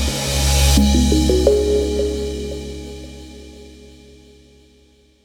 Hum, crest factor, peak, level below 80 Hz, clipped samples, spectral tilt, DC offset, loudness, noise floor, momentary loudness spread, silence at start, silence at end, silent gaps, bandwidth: none; 18 dB; -2 dBFS; -22 dBFS; under 0.1%; -5 dB/octave; under 0.1%; -17 LUFS; -53 dBFS; 23 LU; 0 s; 1.5 s; none; 17.5 kHz